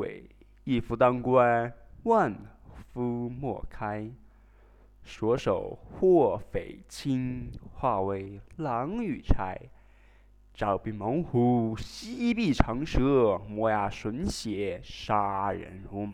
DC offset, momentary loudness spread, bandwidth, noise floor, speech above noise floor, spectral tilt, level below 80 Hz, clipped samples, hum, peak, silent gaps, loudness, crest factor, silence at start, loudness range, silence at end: under 0.1%; 15 LU; 13 kHz; -57 dBFS; 29 dB; -7 dB/octave; -42 dBFS; under 0.1%; none; -2 dBFS; none; -29 LUFS; 28 dB; 0 s; 6 LU; 0 s